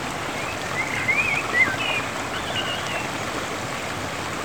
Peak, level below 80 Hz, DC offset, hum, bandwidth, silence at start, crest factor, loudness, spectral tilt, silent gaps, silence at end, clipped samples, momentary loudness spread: -8 dBFS; -50 dBFS; 0.4%; none; over 20 kHz; 0 s; 18 dB; -24 LUFS; -3 dB/octave; none; 0 s; under 0.1%; 8 LU